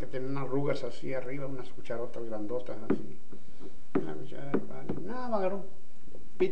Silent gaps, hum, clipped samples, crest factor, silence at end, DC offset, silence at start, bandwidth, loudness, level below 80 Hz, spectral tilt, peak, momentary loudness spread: none; none; under 0.1%; 20 dB; 0 s; 6%; 0 s; 10 kHz; -36 LUFS; -62 dBFS; -8 dB/octave; -14 dBFS; 20 LU